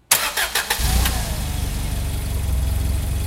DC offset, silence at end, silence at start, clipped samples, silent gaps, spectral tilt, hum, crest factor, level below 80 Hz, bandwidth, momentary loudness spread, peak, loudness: under 0.1%; 0 s; 0.1 s; under 0.1%; none; -3 dB/octave; none; 22 dB; -24 dBFS; 17 kHz; 8 LU; 0 dBFS; -22 LUFS